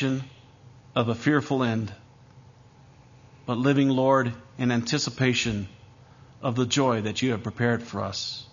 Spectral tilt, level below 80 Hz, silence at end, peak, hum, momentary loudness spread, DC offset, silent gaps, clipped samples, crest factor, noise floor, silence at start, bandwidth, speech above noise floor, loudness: -5.5 dB/octave; -58 dBFS; 0.1 s; -8 dBFS; none; 11 LU; under 0.1%; none; under 0.1%; 20 dB; -53 dBFS; 0 s; 7.4 kHz; 28 dB; -25 LUFS